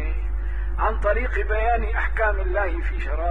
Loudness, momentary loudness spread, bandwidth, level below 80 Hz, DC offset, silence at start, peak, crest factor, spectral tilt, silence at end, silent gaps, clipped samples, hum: -24 LUFS; 7 LU; 3.9 kHz; -24 dBFS; 3%; 0 s; -8 dBFS; 14 dB; -8 dB/octave; 0 s; none; under 0.1%; none